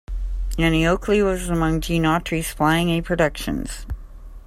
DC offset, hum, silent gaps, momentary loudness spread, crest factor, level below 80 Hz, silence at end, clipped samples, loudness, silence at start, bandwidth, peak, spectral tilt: under 0.1%; none; none; 13 LU; 16 dB; -30 dBFS; 0.05 s; under 0.1%; -21 LUFS; 0.1 s; 15 kHz; -6 dBFS; -5.5 dB/octave